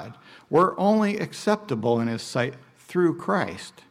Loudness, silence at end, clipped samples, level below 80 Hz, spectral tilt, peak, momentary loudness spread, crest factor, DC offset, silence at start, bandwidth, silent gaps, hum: -24 LUFS; 0.2 s; under 0.1%; -66 dBFS; -6 dB/octave; -8 dBFS; 9 LU; 16 dB; under 0.1%; 0 s; 15 kHz; none; none